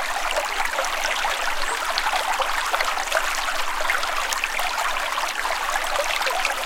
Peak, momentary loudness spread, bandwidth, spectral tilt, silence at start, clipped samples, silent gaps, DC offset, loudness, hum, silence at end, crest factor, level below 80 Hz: 0 dBFS; 2 LU; 17 kHz; 0.5 dB/octave; 0 s; under 0.1%; none; under 0.1%; -23 LUFS; none; 0 s; 24 dB; -38 dBFS